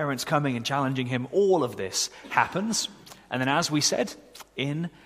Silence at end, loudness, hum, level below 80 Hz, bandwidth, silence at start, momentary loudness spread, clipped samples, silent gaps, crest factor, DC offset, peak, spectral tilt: 0.15 s; -26 LUFS; none; -64 dBFS; 15.5 kHz; 0 s; 9 LU; under 0.1%; none; 22 dB; under 0.1%; -4 dBFS; -4 dB/octave